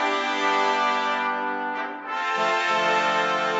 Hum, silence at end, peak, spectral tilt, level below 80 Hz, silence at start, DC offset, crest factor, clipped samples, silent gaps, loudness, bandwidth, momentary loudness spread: none; 0 s; -8 dBFS; -2.5 dB/octave; -80 dBFS; 0 s; under 0.1%; 14 dB; under 0.1%; none; -23 LUFS; 8 kHz; 7 LU